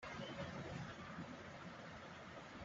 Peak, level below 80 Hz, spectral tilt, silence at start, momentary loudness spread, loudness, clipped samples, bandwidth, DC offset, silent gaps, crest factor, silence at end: -36 dBFS; -70 dBFS; -4 dB/octave; 0 s; 6 LU; -51 LUFS; under 0.1%; 8 kHz; under 0.1%; none; 16 dB; 0 s